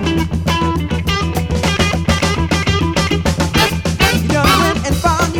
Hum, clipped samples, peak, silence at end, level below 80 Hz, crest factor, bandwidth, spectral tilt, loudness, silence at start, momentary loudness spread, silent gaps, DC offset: none; under 0.1%; 0 dBFS; 0 s; -24 dBFS; 14 dB; 19 kHz; -4.5 dB/octave; -15 LUFS; 0 s; 5 LU; none; 0.5%